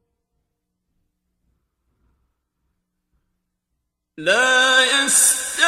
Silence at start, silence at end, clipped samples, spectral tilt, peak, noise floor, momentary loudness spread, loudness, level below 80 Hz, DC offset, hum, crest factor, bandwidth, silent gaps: 4.2 s; 0 s; under 0.1%; 1 dB/octave; -2 dBFS; -77 dBFS; 6 LU; -14 LUFS; -64 dBFS; under 0.1%; none; 20 dB; 16 kHz; none